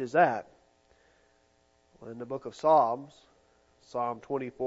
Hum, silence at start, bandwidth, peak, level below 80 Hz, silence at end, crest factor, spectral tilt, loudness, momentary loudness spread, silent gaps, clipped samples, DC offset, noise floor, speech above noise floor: none; 0 s; 8 kHz; -10 dBFS; -74 dBFS; 0 s; 22 dB; -6.5 dB/octave; -29 LUFS; 21 LU; none; under 0.1%; under 0.1%; -68 dBFS; 39 dB